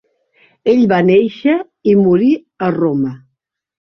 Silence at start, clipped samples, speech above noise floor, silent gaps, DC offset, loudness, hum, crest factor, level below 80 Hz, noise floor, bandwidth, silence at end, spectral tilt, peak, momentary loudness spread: 0.65 s; under 0.1%; 59 dB; none; under 0.1%; -14 LUFS; none; 12 dB; -56 dBFS; -71 dBFS; 6.2 kHz; 0.8 s; -9 dB/octave; -2 dBFS; 8 LU